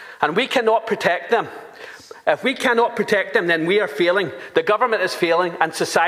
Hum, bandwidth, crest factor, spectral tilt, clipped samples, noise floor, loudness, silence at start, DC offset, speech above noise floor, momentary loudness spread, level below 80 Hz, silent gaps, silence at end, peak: none; 15.5 kHz; 20 dB; -4 dB/octave; under 0.1%; -39 dBFS; -19 LUFS; 0 s; under 0.1%; 20 dB; 6 LU; -68 dBFS; none; 0 s; 0 dBFS